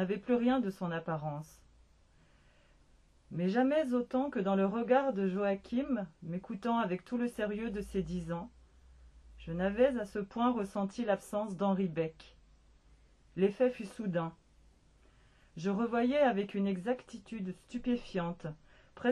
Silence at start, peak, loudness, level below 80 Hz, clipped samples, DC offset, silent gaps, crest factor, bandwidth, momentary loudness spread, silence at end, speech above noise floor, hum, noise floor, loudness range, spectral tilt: 0 s; -16 dBFS; -34 LUFS; -60 dBFS; under 0.1%; under 0.1%; none; 18 dB; 12.5 kHz; 12 LU; 0 s; 32 dB; none; -65 dBFS; 5 LU; -7.5 dB/octave